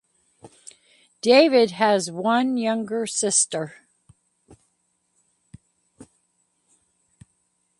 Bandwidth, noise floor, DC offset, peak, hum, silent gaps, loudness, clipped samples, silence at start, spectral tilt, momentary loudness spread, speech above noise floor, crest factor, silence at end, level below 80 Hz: 11.5 kHz; -71 dBFS; under 0.1%; -2 dBFS; none; none; -20 LUFS; under 0.1%; 0.45 s; -3 dB/octave; 11 LU; 51 dB; 22 dB; 1.75 s; -70 dBFS